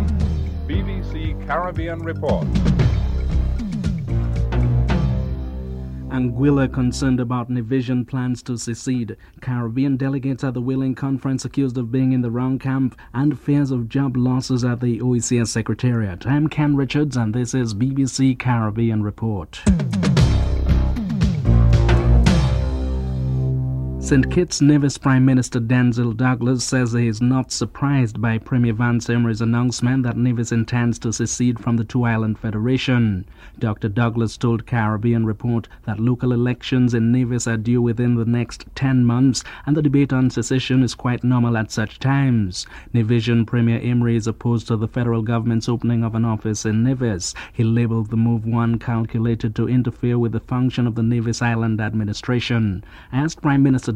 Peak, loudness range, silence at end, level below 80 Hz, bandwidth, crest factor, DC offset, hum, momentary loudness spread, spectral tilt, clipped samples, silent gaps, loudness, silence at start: -2 dBFS; 4 LU; 0 s; -28 dBFS; 10.5 kHz; 16 dB; under 0.1%; none; 7 LU; -6.5 dB/octave; under 0.1%; none; -20 LUFS; 0 s